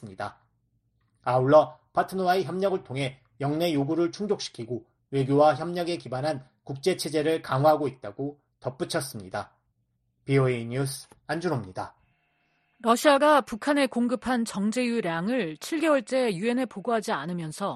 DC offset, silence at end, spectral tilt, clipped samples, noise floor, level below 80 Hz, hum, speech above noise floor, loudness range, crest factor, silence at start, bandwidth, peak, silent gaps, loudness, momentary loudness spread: under 0.1%; 0 s; -5.5 dB/octave; under 0.1%; -73 dBFS; -64 dBFS; none; 48 dB; 6 LU; 20 dB; 0 s; 13.5 kHz; -6 dBFS; none; -26 LUFS; 15 LU